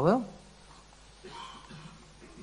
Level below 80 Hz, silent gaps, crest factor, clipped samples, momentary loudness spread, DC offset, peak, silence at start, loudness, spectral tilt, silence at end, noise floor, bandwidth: -60 dBFS; none; 24 dB; under 0.1%; 23 LU; under 0.1%; -10 dBFS; 0 s; -36 LUFS; -7 dB/octave; 0 s; -55 dBFS; 10 kHz